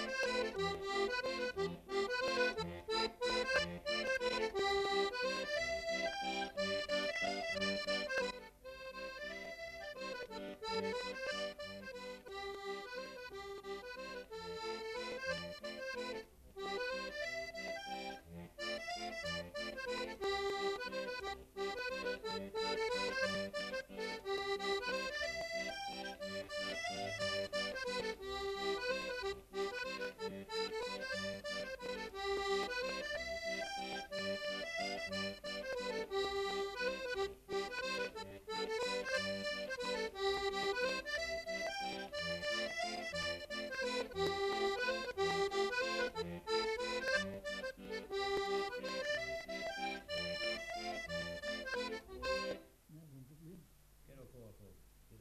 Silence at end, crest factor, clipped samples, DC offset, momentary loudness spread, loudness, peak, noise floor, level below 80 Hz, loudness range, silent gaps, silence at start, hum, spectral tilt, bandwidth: 0 s; 20 dB; under 0.1%; under 0.1%; 10 LU; -40 LUFS; -22 dBFS; -63 dBFS; -64 dBFS; 6 LU; none; 0 s; none; -3 dB/octave; 14 kHz